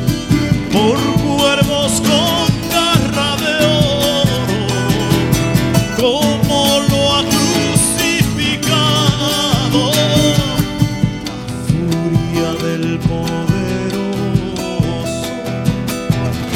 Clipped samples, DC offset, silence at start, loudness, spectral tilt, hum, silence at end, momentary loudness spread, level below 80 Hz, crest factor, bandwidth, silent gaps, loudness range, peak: under 0.1%; under 0.1%; 0 s; -14 LUFS; -4.5 dB/octave; none; 0 s; 6 LU; -32 dBFS; 14 dB; 17.5 kHz; none; 5 LU; 0 dBFS